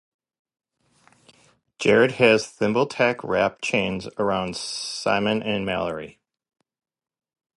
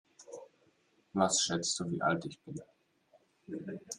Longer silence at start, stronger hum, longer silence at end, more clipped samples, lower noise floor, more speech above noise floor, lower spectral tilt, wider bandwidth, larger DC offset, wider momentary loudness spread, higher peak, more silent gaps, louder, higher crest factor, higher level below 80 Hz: first, 1.8 s vs 0.2 s; neither; first, 1.5 s vs 0 s; neither; second, -61 dBFS vs -71 dBFS; about the same, 38 dB vs 37 dB; first, -4.5 dB/octave vs -3 dB/octave; second, 11.5 kHz vs 13 kHz; neither; second, 10 LU vs 22 LU; first, -4 dBFS vs -14 dBFS; neither; first, -22 LUFS vs -33 LUFS; about the same, 22 dB vs 22 dB; first, -58 dBFS vs -76 dBFS